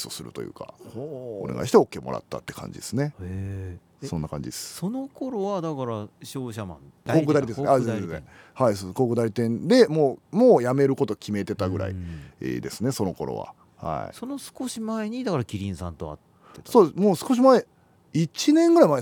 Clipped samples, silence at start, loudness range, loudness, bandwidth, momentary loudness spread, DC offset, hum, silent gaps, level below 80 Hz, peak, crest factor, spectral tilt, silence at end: under 0.1%; 0 s; 10 LU; -24 LUFS; 19.5 kHz; 18 LU; under 0.1%; none; none; -56 dBFS; -4 dBFS; 20 dB; -6.5 dB/octave; 0 s